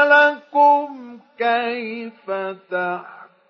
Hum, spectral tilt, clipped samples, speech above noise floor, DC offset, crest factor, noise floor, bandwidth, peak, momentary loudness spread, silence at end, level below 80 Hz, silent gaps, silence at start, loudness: none; -5 dB/octave; under 0.1%; 11 dB; under 0.1%; 16 dB; -38 dBFS; 6.6 kHz; -2 dBFS; 17 LU; 0.25 s; -88 dBFS; none; 0 s; -19 LUFS